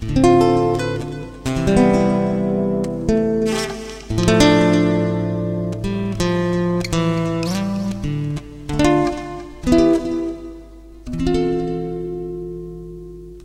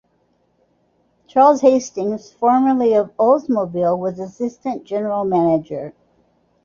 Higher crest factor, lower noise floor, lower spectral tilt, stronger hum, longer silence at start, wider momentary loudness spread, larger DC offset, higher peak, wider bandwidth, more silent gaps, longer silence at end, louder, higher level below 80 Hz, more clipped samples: about the same, 18 dB vs 16 dB; second, -39 dBFS vs -63 dBFS; about the same, -6.5 dB/octave vs -7 dB/octave; neither; second, 0 s vs 1.35 s; first, 15 LU vs 12 LU; neither; about the same, 0 dBFS vs -2 dBFS; first, 15.5 kHz vs 7.4 kHz; neither; second, 0 s vs 0.75 s; about the same, -19 LUFS vs -18 LUFS; first, -34 dBFS vs -62 dBFS; neither